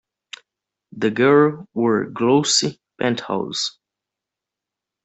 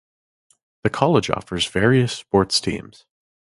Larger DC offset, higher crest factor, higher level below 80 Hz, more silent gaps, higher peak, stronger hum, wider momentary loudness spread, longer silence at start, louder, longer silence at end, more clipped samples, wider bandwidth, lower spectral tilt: neither; about the same, 18 dB vs 22 dB; second, -64 dBFS vs -46 dBFS; neither; second, -4 dBFS vs 0 dBFS; neither; first, 21 LU vs 9 LU; about the same, 0.95 s vs 0.85 s; about the same, -19 LUFS vs -20 LUFS; first, 1.35 s vs 0.75 s; neither; second, 8.4 kHz vs 11.5 kHz; about the same, -4 dB/octave vs -5 dB/octave